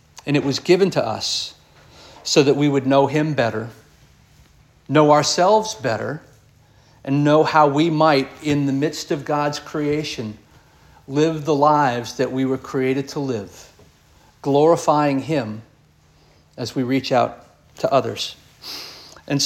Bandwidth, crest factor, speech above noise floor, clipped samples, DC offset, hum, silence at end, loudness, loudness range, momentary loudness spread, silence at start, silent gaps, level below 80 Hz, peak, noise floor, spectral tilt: 16 kHz; 20 dB; 36 dB; under 0.1%; under 0.1%; none; 0 s; -19 LUFS; 5 LU; 16 LU; 0.15 s; none; -58 dBFS; -2 dBFS; -54 dBFS; -5 dB/octave